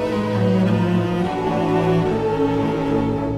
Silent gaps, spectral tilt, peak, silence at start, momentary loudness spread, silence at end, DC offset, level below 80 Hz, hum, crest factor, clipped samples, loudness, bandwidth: none; -8 dB/octave; -6 dBFS; 0 s; 3 LU; 0 s; under 0.1%; -40 dBFS; none; 14 dB; under 0.1%; -19 LUFS; 11.5 kHz